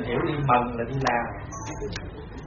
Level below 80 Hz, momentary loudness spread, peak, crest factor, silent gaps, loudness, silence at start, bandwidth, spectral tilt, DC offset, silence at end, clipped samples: -42 dBFS; 13 LU; -8 dBFS; 18 dB; none; -27 LUFS; 0 s; 7.2 kHz; -5 dB/octave; under 0.1%; 0 s; under 0.1%